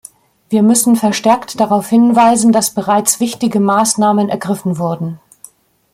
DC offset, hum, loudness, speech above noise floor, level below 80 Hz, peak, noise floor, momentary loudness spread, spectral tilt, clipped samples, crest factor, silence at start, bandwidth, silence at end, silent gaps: under 0.1%; none; -13 LUFS; 31 dB; -56 dBFS; 0 dBFS; -43 dBFS; 9 LU; -4.5 dB/octave; under 0.1%; 14 dB; 0.5 s; 15.5 kHz; 0.75 s; none